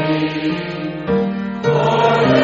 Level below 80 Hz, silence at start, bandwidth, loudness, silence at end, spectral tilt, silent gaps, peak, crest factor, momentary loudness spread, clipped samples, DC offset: -48 dBFS; 0 s; 7.6 kHz; -17 LUFS; 0 s; -5 dB/octave; none; -2 dBFS; 14 dB; 9 LU; under 0.1%; under 0.1%